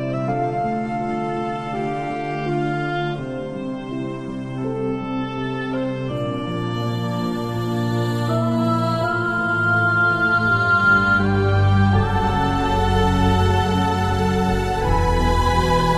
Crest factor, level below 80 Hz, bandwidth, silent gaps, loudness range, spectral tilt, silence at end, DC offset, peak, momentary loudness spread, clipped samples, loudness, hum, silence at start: 14 dB; -32 dBFS; 13.5 kHz; none; 8 LU; -7 dB/octave; 0 s; 0.1%; -6 dBFS; 9 LU; under 0.1%; -20 LUFS; none; 0 s